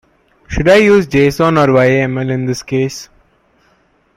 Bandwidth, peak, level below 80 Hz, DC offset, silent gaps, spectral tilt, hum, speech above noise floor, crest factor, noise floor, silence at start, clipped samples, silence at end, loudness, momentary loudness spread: 15.5 kHz; 0 dBFS; -36 dBFS; under 0.1%; none; -6 dB/octave; none; 43 dB; 14 dB; -55 dBFS; 0.5 s; under 0.1%; 1.1 s; -12 LUFS; 11 LU